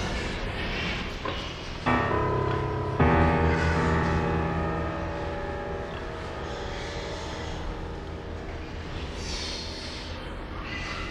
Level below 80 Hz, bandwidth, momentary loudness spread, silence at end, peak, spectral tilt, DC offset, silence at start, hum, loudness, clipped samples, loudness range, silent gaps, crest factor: -36 dBFS; 10.5 kHz; 13 LU; 0 s; -8 dBFS; -6 dB/octave; under 0.1%; 0 s; none; -29 LUFS; under 0.1%; 10 LU; none; 20 dB